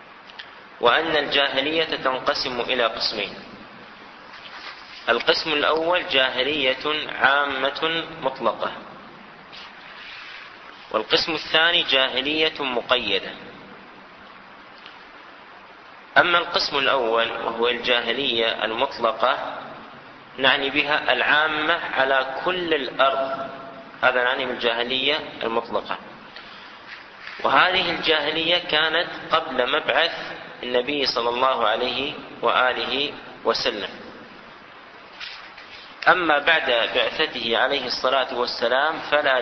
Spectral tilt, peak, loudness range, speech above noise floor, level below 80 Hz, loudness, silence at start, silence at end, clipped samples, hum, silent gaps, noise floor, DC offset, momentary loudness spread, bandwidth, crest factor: -3.5 dB/octave; -2 dBFS; 5 LU; 23 dB; -58 dBFS; -21 LUFS; 0 s; 0 s; under 0.1%; none; none; -44 dBFS; under 0.1%; 21 LU; 6.4 kHz; 22 dB